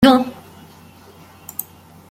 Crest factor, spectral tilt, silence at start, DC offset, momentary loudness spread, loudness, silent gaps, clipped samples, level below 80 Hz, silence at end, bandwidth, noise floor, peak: 18 dB; -5 dB/octave; 0 s; under 0.1%; 27 LU; -20 LUFS; none; under 0.1%; -50 dBFS; 0.5 s; 16.5 kHz; -44 dBFS; -2 dBFS